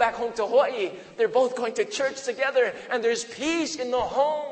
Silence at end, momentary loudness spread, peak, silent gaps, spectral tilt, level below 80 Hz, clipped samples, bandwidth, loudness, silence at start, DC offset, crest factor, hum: 0 s; 5 LU; -6 dBFS; none; -2.5 dB/octave; -60 dBFS; under 0.1%; 8.8 kHz; -25 LUFS; 0 s; under 0.1%; 20 dB; none